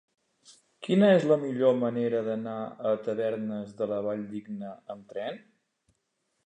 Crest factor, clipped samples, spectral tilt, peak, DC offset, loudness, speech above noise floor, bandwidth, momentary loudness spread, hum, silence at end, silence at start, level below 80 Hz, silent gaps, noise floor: 18 dB; under 0.1%; -7.5 dB/octave; -10 dBFS; under 0.1%; -28 LUFS; 50 dB; 9.6 kHz; 17 LU; none; 1.1 s; 0.5 s; -78 dBFS; none; -78 dBFS